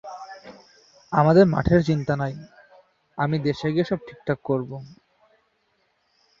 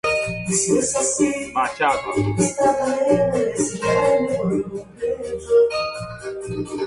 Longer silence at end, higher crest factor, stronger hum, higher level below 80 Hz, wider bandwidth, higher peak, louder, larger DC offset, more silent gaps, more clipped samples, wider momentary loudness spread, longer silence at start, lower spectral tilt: first, 1.45 s vs 0 s; first, 22 dB vs 14 dB; neither; about the same, -48 dBFS vs -48 dBFS; second, 7.4 kHz vs 11.5 kHz; about the same, -4 dBFS vs -6 dBFS; about the same, -22 LUFS vs -20 LUFS; neither; neither; neither; first, 23 LU vs 10 LU; about the same, 0.05 s vs 0.05 s; first, -8 dB/octave vs -4.5 dB/octave